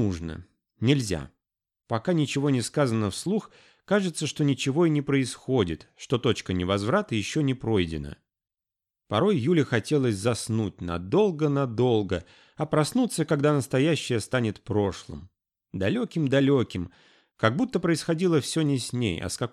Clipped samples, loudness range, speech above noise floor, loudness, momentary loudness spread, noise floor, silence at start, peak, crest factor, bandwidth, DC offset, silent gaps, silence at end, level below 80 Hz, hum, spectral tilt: under 0.1%; 2 LU; over 65 dB; -26 LUFS; 9 LU; under -90 dBFS; 0 s; -6 dBFS; 20 dB; 13.5 kHz; under 0.1%; none; 0.05 s; -54 dBFS; none; -6 dB/octave